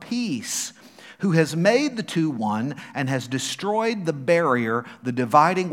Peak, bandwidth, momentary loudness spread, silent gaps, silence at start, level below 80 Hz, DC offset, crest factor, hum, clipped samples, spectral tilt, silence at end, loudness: -2 dBFS; 16.5 kHz; 9 LU; none; 0 s; -74 dBFS; under 0.1%; 20 dB; none; under 0.1%; -5 dB/octave; 0 s; -23 LUFS